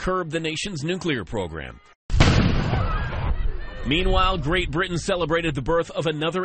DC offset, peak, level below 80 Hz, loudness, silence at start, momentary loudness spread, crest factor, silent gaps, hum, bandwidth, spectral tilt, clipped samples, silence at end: under 0.1%; -4 dBFS; -28 dBFS; -24 LUFS; 0 s; 10 LU; 18 dB; 1.95-2.09 s; none; 8.8 kHz; -5.5 dB/octave; under 0.1%; 0 s